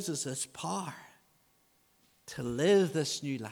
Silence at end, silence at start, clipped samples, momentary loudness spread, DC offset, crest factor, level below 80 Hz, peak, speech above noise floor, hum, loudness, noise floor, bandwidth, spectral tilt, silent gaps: 0 s; 0 s; under 0.1%; 19 LU; under 0.1%; 18 dB; -68 dBFS; -16 dBFS; 38 dB; none; -32 LUFS; -70 dBFS; 19.5 kHz; -4.5 dB/octave; none